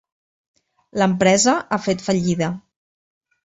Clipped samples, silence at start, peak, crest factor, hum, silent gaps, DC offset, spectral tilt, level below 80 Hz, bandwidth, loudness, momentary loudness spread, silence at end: under 0.1%; 0.95 s; -2 dBFS; 18 dB; none; none; under 0.1%; -4.5 dB/octave; -56 dBFS; 8 kHz; -19 LUFS; 11 LU; 0.85 s